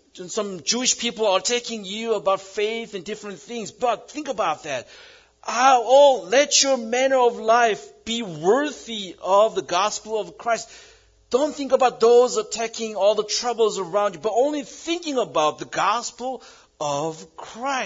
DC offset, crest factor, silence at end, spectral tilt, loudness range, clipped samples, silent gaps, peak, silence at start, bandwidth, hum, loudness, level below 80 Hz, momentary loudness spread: under 0.1%; 18 dB; 0 s; -2 dB/octave; 7 LU; under 0.1%; none; -4 dBFS; 0.15 s; 7.8 kHz; none; -21 LUFS; -64 dBFS; 14 LU